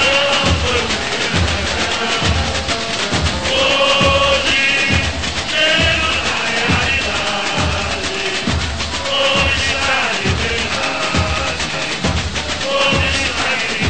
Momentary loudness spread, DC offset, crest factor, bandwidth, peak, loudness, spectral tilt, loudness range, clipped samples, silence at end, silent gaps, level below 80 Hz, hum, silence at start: 6 LU; 2%; 16 dB; 9.2 kHz; -2 dBFS; -15 LUFS; -3 dB/octave; 3 LU; under 0.1%; 0 s; none; -30 dBFS; none; 0 s